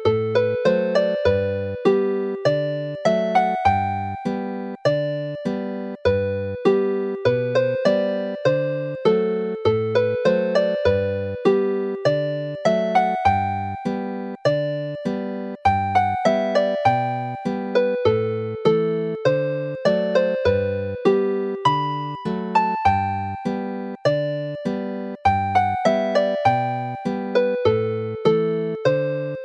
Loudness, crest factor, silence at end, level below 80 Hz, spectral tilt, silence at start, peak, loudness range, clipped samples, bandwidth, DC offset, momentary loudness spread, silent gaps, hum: -21 LUFS; 18 dB; 0 s; -52 dBFS; -7 dB/octave; 0 s; -4 dBFS; 2 LU; under 0.1%; 9.2 kHz; under 0.1%; 7 LU; none; none